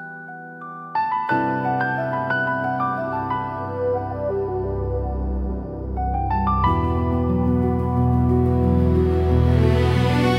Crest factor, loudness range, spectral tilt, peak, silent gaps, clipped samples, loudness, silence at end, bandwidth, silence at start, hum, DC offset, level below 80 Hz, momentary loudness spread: 16 dB; 6 LU; -8.5 dB/octave; -4 dBFS; none; under 0.1%; -21 LUFS; 0 s; 10 kHz; 0 s; none; under 0.1%; -32 dBFS; 9 LU